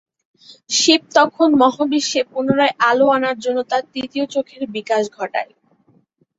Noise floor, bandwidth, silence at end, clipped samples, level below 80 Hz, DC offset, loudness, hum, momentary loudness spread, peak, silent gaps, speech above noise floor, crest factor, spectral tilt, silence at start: -58 dBFS; 8 kHz; 0.95 s; under 0.1%; -64 dBFS; under 0.1%; -17 LUFS; none; 11 LU; -2 dBFS; none; 40 dB; 16 dB; -2.5 dB/octave; 0.5 s